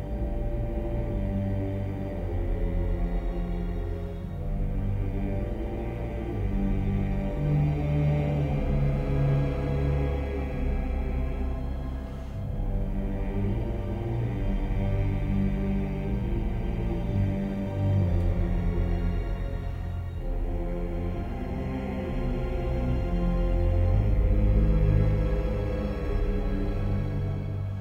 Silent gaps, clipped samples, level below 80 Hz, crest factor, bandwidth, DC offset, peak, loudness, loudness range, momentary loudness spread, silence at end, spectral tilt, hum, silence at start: none; under 0.1%; -30 dBFS; 14 dB; 5.6 kHz; under 0.1%; -12 dBFS; -29 LUFS; 6 LU; 8 LU; 0 s; -9.5 dB/octave; none; 0 s